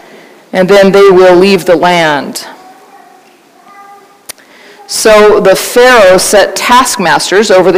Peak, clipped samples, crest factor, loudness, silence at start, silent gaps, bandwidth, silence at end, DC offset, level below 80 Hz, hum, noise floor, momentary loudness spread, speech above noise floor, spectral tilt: 0 dBFS; 3%; 6 dB; -5 LUFS; 0.55 s; none; 16.5 kHz; 0 s; under 0.1%; -38 dBFS; none; -40 dBFS; 9 LU; 36 dB; -3.5 dB/octave